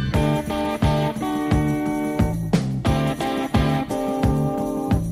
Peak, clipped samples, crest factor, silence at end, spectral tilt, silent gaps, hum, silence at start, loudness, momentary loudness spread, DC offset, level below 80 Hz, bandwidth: -4 dBFS; under 0.1%; 16 dB; 0 s; -7 dB/octave; none; none; 0 s; -22 LUFS; 3 LU; under 0.1%; -32 dBFS; 15 kHz